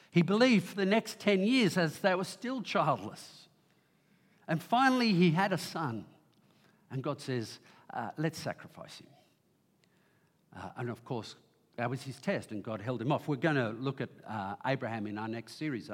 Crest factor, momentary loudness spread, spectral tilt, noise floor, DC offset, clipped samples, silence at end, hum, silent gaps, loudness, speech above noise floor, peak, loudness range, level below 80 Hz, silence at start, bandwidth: 20 dB; 19 LU; -6 dB/octave; -71 dBFS; under 0.1%; under 0.1%; 0 s; none; none; -32 LUFS; 39 dB; -12 dBFS; 12 LU; -84 dBFS; 0.15 s; 16.5 kHz